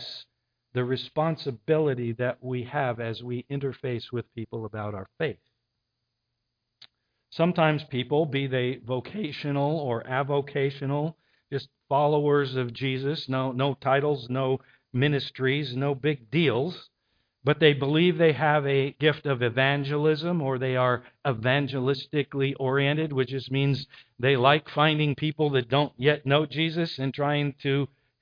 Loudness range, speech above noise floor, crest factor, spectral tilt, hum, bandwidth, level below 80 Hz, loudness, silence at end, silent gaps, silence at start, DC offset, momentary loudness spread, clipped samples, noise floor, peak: 8 LU; 55 dB; 20 dB; -8.5 dB/octave; none; 5.2 kHz; -66 dBFS; -26 LUFS; 0.35 s; none; 0 s; under 0.1%; 11 LU; under 0.1%; -81 dBFS; -6 dBFS